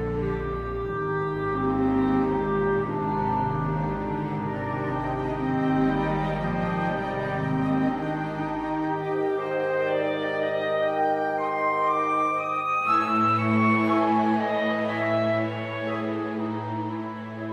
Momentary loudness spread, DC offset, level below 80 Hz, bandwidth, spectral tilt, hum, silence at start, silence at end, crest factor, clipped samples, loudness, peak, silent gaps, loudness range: 7 LU; under 0.1%; -46 dBFS; 10.5 kHz; -8 dB/octave; none; 0 s; 0 s; 14 dB; under 0.1%; -26 LUFS; -12 dBFS; none; 4 LU